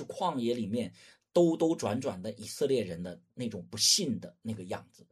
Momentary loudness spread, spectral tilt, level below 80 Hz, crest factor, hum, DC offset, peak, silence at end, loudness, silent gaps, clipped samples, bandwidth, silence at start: 16 LU; -4 dB/octave; -70 dBFS; 20 dB; none; under 0.1%; -12 dBFS; 0.3 s; -31 LUFS; none; under 0.1%; 13.5 kHz; 0 s